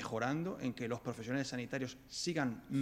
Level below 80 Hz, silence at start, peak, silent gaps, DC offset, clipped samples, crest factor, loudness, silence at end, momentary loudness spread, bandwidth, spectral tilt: -68 dBFS; 0 s; -20 dBFS; none; under 0.1%; under 0.1%; 18 dB; -39 LUFS; 0 s; 5 LU; 16 kHz; -5 dB/octave